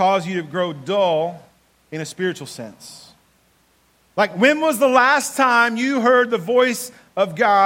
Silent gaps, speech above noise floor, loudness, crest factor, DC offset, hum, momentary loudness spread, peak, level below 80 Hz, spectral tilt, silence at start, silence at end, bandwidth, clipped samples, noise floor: none; 41 dB; -18 LUFS; 18 dB; under 0.1%; none; 16 LU; 0 dBFS; -68 dBFS; -4 dB/octave; 0 s; 0 s; 16.5 kHz; under 0.1%; -59 dBFS